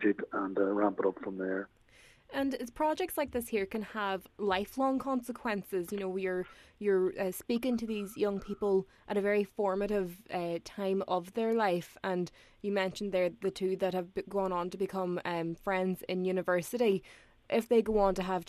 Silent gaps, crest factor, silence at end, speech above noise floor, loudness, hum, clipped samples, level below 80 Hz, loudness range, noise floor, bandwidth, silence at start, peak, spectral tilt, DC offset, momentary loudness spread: none; 18 dB; 0.05 s; 28 dB; -33 LUFS; none; under 0.1%; -58 dBFS; 2 LU; -61 dBFS; 14 kHz; 0 s; -14 dBFS; -6 dB/octave; under 0.1%; 7 LU